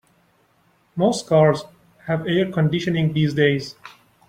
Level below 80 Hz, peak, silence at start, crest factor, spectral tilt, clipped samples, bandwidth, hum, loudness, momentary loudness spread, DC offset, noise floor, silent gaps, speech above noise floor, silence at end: -56 dBFS; -2 dBFS; 0.95 s; 18 dB; -6.5 dB/octave; under 0.1%; 10.5 kHz; none; -20 LUFS; 12 LU; under 0.1%; -61 dBFS; none; 42 dB; 0.4 s